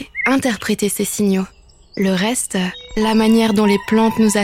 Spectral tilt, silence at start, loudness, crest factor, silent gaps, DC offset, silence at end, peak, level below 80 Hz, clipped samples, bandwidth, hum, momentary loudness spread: -4.5 dB/octave; 0 s; -17 LUFS; 14 dB; none; under 0.1%; 0 s; -4 dBFS; -44 dBFS; under 0.1%; 16 kHz; none; 8 LU